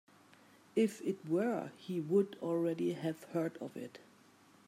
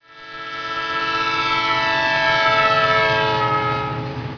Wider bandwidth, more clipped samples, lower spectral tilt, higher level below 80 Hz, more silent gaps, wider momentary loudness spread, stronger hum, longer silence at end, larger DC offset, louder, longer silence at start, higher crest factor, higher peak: first, 15.5 kHz vs 5.4 kHz; neither; first, -7 dB/octave vs -4.5 dB/octave; second, -88 dBFS vs -48 dBFS; neither; about the same, 11 LU vs 12 LU; neither; first, 0.65 s vs 0 s; neither; second, -36 LUFS vs -18 LUFS; first, 0.75 s vs 0.1 s; about the same, 18 dB vs 14 dB; second, -20 dBFS vs -4 dBFS